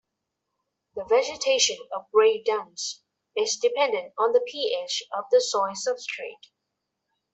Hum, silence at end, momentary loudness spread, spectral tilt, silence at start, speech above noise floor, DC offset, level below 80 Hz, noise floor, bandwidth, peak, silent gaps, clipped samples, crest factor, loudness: none; 1 s; 13 LU; 0 dB/octave; 0.95 s; 58 dB; under 0.1%; -74 dBFS; -82 dBFS; 8.4 kHz; -8 dBFS; none; under 0.1%; 18 dB; -25 LUFS